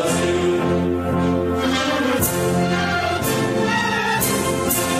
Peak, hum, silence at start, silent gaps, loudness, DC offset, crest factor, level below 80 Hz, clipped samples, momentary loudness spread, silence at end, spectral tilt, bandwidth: -4 dBFS; none; 0 s; none; -19 LUFS; under 0.1%; 14 dB; -42 dBFS; under 0.1%; 2 LU; 0 s; -4.5 dB/octave; 16 kHz